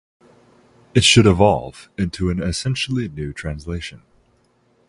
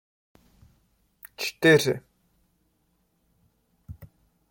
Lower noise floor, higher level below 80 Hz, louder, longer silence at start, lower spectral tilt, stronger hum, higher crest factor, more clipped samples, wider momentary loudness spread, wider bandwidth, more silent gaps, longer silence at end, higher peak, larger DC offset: second, -60 dBFS vs -71 dBFS; first, -36 dBFS vs -62 dBFS; first, -18 LUFS vs -23 LUFS; second, 0.95 s vs 1.25 s; about the same, -4.5 dB/octave vs -4.5 dB/octave; neither; about the same, 20 dB vs 22 dB; neither; second, 17 LU vs 28 LU; second, 11.5 kHz vs 16.5 kHz; neither; first, 0.9 s vs 0.45 s; first, 0 dBFS vs -8 dBFS; neither